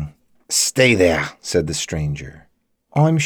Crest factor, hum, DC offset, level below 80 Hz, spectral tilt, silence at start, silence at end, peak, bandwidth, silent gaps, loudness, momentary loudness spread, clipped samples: 16 dB; none; under 0.1%; -42 dBFS; -4 dB/octave; 0 s; 0 s; -2 dBFS; over 20 kHz; none; -18 LUFS; 15 LU; under 0.1%